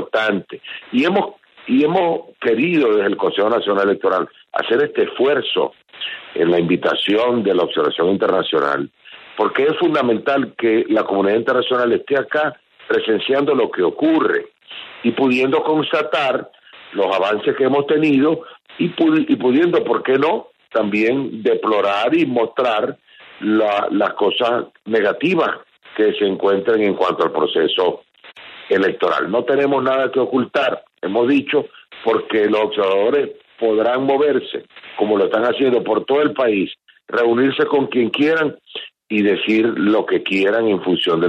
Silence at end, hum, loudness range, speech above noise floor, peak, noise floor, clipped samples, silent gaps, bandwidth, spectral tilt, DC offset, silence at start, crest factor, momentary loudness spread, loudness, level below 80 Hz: 0 s; none; 1 LU; 24 dB; -4 dBFS; -41 dBFS; under 0.1%; none; 7.8 kHz; -7 dB/octave; under 0.1%; 0 s; 14 dB; 8 LU; -17 LUFS; -66 dBFS